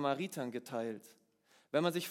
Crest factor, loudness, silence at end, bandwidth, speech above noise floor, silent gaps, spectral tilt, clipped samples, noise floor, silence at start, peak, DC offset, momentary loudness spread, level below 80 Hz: 20 dB; -38 LUFS; 0 s; 17.5 kHz; 34 dB; none; -5 dB/octave; under 0.1%; -71 dBFS; 0 s; -18 dBFS; under 0.1%; 9 LU; under -90 dBFS